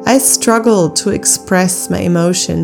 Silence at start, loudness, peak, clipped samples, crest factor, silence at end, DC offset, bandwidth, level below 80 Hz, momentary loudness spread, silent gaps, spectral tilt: 0 s; -12 LUFS; 0 dBFS; 0.3%; 12 dB; 0 s; under 0.1%; over 20 kHz; -46 dBFS; 5 LU; none; -4 dB/octave